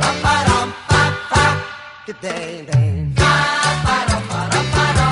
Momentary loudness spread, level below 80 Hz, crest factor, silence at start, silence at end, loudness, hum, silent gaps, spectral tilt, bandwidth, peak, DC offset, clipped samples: 12 LU; -30 dBFS; 14 dB; 0 s; 0 s; -16 LUFS; none; none; -4.5 dB/octave; 11 kHz; -2 dBFS; under 0.1%; under 0.1%